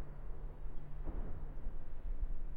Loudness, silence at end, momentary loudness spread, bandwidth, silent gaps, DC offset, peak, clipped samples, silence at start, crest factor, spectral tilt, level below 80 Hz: -50 LUFS; 0 s; 5 LU; 2.4 kHz; none; under 0.1%; -28 dBFS; under 0.1%; 0 s; 10 dB; -9.5 dB/octave; -40 dBFS